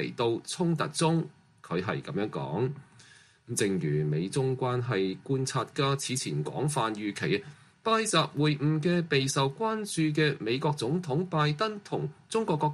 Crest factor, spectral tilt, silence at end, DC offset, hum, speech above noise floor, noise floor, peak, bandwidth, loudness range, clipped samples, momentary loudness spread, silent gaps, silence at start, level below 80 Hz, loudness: 20 dB; -5 dB/octave; 0 s; under 0.1%; none; 28 dB; -57 dBFS; -10 dBFS; 13 kHz; 4 LU; under 0.1%; 6 LU; none; 0 s; -66 dBFS; -29 LUFS